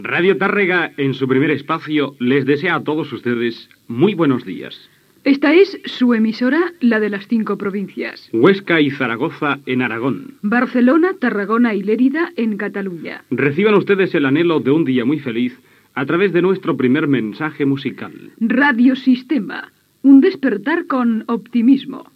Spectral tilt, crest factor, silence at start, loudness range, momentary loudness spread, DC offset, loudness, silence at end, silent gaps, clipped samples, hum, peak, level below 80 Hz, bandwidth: -8 dB/octave; 16 dB; 0 s; 3 LU; 10 LU; under 0.1%; -16 LUFS; 0.15 s; none; under 0.1%; none; 0 dBFS; -74 dBFS; 6 kHz